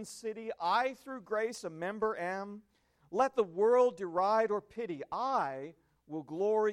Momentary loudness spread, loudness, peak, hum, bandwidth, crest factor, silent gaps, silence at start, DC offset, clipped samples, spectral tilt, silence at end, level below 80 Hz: 16 LU; -33 LUFS; -16 dBFS; none; 13.5 kHz; 16 dB; none; 0 s; under 0.1%; under 0.1%; -5 dB/octave; 0 s; -76 dBFS